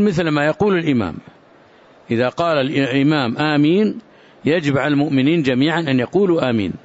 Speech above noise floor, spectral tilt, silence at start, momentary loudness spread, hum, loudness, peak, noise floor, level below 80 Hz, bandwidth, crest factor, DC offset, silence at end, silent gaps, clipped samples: 32 dB; -7 dB/octave; 0 s; 5 LU; none; -17 LUFS; -6 dBFS; -48 dBFS; -52 dBFS; 8 kHz; 12 dB; under 0.1%; 0.05 s; none; under 0.1%